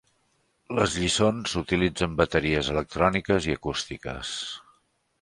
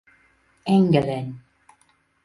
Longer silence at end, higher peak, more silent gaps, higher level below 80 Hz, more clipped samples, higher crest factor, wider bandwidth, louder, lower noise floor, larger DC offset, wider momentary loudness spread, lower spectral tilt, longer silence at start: second, 0.6 s vs 0.85 s; about the same, -6 dBFS vs -4 dBFS; neither; first, -44 dBFS vs -56 dBFS; neither; about the same, 22 dB vs 20 dB; about the same, 11.5 kHz vs 11.5 kHz; second, -26 LUFS vs -21 LUFS; first, -70 dBFS vs -63 dBFS; neither; second, 10 LU vs 18 LU; second, -4.5 dB/octave vs -8.5 dB/octave; about the same, 0.7 s vs 0.65 s